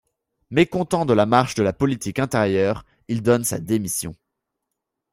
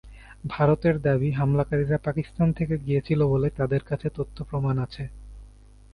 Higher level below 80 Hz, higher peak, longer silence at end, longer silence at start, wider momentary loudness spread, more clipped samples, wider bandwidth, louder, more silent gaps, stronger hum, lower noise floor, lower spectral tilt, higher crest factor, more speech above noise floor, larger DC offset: second, -52 dBFS vs -44 dBFS; first, -2 dBFS vs -6 dBFS; first, 1 s vs 0.45 s; first, 0.5 s vs 0.05 s; second, 8 LU vs 11 LU; neither; first, 16 kHz vs 5.2 kHz; first, -21 LUFS vs -25 LUFS; neither; neither; first, -81 dBFS vs -49 dBFS; second, -5.5 dB/octave vs -9.5 dB/octave; about the same, 20 dB vs 18 dB; first, 61 dB vs 25 dB; neither